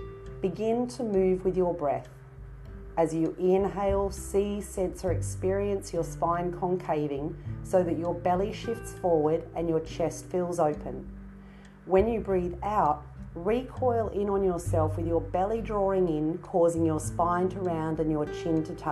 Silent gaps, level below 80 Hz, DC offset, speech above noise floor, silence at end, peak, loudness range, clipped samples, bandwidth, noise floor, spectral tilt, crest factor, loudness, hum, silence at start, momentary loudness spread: none; -44 dBFS; under 0.1%; 21 dB; 0 s; -10 dBFS; 2 LU; under 0.1%; 12.5 kHz; -48 dBFS; -7 dB/octave; 18 dB; -29 LUFS; none; 0 s; 10 LU